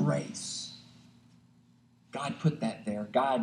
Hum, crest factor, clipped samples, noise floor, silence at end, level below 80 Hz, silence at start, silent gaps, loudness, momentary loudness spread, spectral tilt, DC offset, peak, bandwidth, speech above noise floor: none; 20 dB; under 0.1%; -63 dBFS; 0 s; -74 dBFS; 0 s; none; -33 LUFS; 14 LU; -5.5 dB/octave; under 0.1%; -14 dBFS; 11.5 kHz; 32 dB